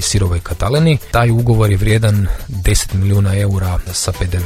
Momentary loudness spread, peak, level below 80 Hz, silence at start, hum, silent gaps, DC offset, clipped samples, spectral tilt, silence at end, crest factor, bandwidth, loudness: 6 LU; 0 dBFS; -24 dBFS; 0 s; none; none; under 0.1%; under 0.1%; -5.5 dB/octave; 0 s; 14 dB; 15.5 kHz; -15 LUFS